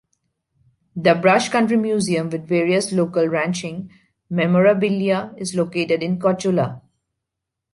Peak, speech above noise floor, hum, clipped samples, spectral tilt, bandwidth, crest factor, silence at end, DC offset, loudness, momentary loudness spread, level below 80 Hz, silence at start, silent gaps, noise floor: -2 dBFS; 63 dB; none; under 0.1%; -5.5 dB/octave; 11.5 kHz; 18 dB; 0.95 s; under 0.1%; -19 LUFS; 11 LU; -62 dBFS; 0.95 s; none; -82 dBFS